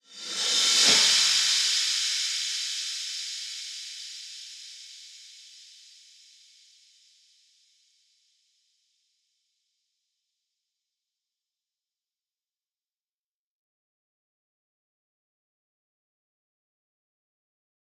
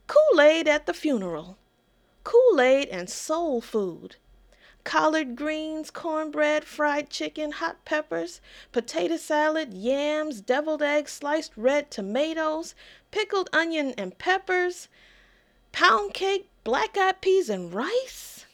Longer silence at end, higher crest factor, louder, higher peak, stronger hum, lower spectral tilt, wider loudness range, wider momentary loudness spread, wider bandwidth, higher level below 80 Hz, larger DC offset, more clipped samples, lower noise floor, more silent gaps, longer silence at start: first, 12.35 s vs 0.1 s; first, 26 dB vs 20 dB; first, -22 LUFS vs -25 LUFS; about the same, -8 dBFS vs -6 dBFS; neither; second, 2.5 dB/octave vs -3.5 dB/octave; first, 24 LU vs 4 LU; first, 25 LU vs 13 LU; about the same, 16.5 kHz vs 17 kHz; second, -86 dBFS vs -62 dBFS; neither; neither; first, under -90 dBFS vs -65 dBFS; neither; about the same, 0.1 s vs 0.1 s